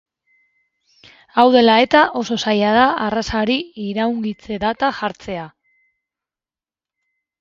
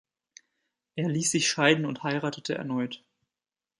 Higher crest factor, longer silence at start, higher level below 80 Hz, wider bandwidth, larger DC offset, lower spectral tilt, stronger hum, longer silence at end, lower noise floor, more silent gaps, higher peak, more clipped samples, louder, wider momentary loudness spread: second, 18 dB vs 24 dB; first, 1.35 s vs 0.95 s; first, -48 dBFS vs -74 dBFS; second, 7.6 kHz vs 11.5 kHz; neither; first, -5 dB/octave vs -3.5 dB/octave; neither; first, 1.95 s vs 0.8 s; about the same, under -90 dBFS vs under -90 dBFS; neither; first, 0 dBFS vs -6 dBFS; neither; first, -17 LUFS vs -27 LUFS; about the same, 14 LU vs 12 LU